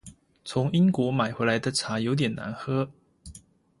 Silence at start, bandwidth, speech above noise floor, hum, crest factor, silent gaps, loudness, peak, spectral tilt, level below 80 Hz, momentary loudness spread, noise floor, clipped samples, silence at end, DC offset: 0.05 s; 11.5 kHz; 27 dB; none; 18 dB; none; -26 LUFS; -10 dBFS; -5.5 dB/octave; -58 dBFS; 21 LU; -52 dBFS; under 0.1%; 0.4 s; under 0.1%